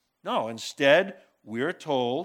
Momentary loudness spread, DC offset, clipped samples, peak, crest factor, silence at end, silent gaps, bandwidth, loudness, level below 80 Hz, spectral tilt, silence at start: 13 LU; under 0.1%; under 0.1%; -6 dBFS; 22 dB; 0 s; none; 15.5 kHz; -26 LUFS; -84 dBFS; -4 dB/octave; 0.25 s